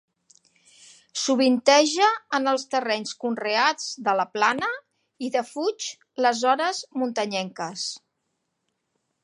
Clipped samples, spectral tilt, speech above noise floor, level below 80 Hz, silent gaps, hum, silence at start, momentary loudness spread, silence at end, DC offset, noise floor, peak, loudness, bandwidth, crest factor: under 0.1%; -2.5 dB/octave; 54 dB; -80 dBFS; none; none; 1.15 s; 13 LU; 1.25 s; under 0.1%; -77 dBFS; -4 dBFS; -24 LUFS; 11.5 kHz; 22 dB